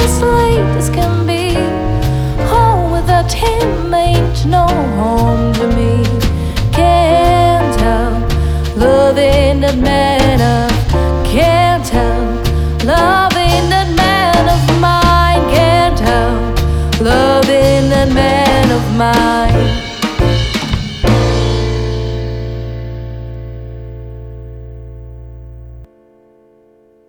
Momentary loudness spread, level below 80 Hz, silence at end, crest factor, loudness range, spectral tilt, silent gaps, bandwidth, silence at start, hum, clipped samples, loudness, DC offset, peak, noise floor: 13 LU; -18 dBFS; 1.25 s; 12 dB; 10 LU; -6 dB/octave; none; 17.5 kHz; 0 s; none; under 0.1%; -12 LUFS; under 0.1%; 0 dBFS; -48 dBFS